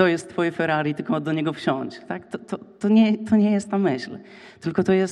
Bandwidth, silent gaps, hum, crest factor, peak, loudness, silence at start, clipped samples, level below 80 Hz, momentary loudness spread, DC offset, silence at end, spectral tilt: 10.5 kHz; none; none; 16 dB; -6 dBFS; -23 LUFS; 0 s; under 0.1%; -64 dBFS; 14 LU; under 0.1%; 0 s; -6.5 dB/octave